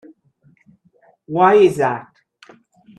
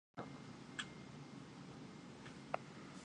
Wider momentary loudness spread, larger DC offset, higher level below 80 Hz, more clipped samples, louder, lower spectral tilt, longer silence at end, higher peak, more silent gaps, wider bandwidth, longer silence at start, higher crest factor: first, 15 LU vs 7 LU; neither; first, -64 dBFS vs -76 dBFS; neither; first, -15 LUFS vs -52 LUFS; first, -6.5 dB/octave vs -4.5 dB/octave; first, 0.95 s vs 0 s; first, -2 dBFS vs -22 dBFS; neither; first, 12.5 kHz vs 11 kHz; first, 1.3 s vs 0.15 s; second, 18 dB vs 30 dB